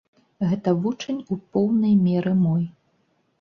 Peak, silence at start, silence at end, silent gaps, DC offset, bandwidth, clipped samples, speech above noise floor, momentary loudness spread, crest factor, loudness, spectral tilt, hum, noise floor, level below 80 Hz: -8 dBFS; 0.4 s; 0.7 s; none; under 0.1%; 6.8 kHz; under 0.1%; 46 dB; 10 LU; 16 dB; -22 LUFS; -8.5 dB/octave; none; -67 dBFS; -62 dBFS